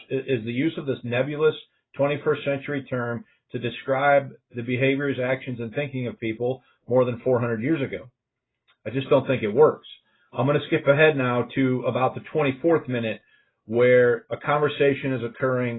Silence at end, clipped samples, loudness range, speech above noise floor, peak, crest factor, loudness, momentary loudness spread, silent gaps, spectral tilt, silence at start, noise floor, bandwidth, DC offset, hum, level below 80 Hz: 0 s; under 0.1%; 4 LU; 60 dB; -4 dBFS; 18 dB; -23 LUFS; 12 LU; none; -11.5 dB/octave; 0.1 s; -83 dBFS; 4.1 kHz; under 0.1%; none; -64 dBFS